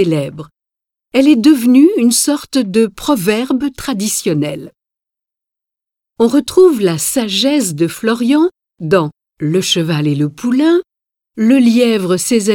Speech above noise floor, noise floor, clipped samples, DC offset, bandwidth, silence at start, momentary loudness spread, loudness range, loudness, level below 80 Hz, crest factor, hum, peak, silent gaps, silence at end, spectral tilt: 72 dB; -85 dBFS; under 0.1%; under 0.1%; 18 kHz; 0 s; 9 LU; 5 LU; -13 LUFS; -50 dBFS; 14 dB; none; 0 dBFS; none; 0 s; -4.5 dB/octave